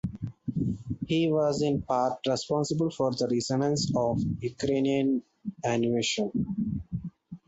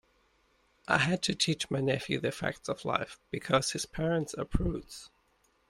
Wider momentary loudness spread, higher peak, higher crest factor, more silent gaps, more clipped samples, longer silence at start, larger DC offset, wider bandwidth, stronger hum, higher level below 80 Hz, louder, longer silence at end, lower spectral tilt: about the same, 9 LU vs 11 LU; second, -14 dBFS vs -10 dBFS; second, 14 dB vs 22 dB; neither; neither; second, 0.05 s vs 0.9 s; neither; second, 8.2 kHz vs 16 kHz; neither; second, -52 dBFS vs -46 dBFS; first, -28 LUFS vs -31 LUFS; second, 0.1 s vs 0.65 s; first, -5.5 dB/octave vs -4 dB/octave